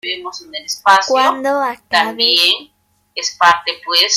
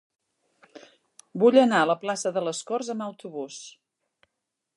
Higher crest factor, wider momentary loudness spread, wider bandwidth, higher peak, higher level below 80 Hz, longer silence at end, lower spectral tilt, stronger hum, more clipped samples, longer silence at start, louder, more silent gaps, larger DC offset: about the same, 16 dB vs 20 dB; second, 13 LU vs 20 LU; first, 16 kHz vs 11.5 kHz; first, 0 dBFS vs -6 dBFS; first, -62 dBFS vs -82 dBFS; second, 0 s vs 1.05 s; second, 0 dB/octave vs -4.5 dB/octave; neither; neither; second, 0.05 s vs 0.75 s; first, -14 LUFS vs -24 LUFS; neither; neither